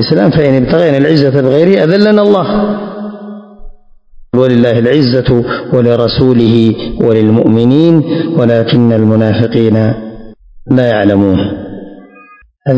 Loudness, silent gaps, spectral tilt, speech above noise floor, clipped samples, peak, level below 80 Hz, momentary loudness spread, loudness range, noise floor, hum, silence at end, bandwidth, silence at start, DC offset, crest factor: -9 LUFS; none; -9 dB/octave; 32 dB; 3%; 0 dBFS; -36 dBFS; 12 LU; 3 LU; -40 dBFS; none; 0 s; 8 kHz; 0 s; 0.3%; 10 dB